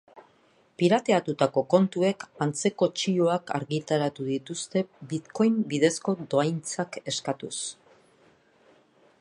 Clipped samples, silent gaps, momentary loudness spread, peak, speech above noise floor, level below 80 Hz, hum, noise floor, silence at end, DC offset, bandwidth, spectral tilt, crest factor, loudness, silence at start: under 0.1%; none; 9 LU; -6 dBFS; 37 dB; -74 dBFS; none; -63 dBFS; 1.5 s; under 0.1%; 11.5 kHz; -5 dB/octave; 20 dB; -27 LUFS; 0.15 s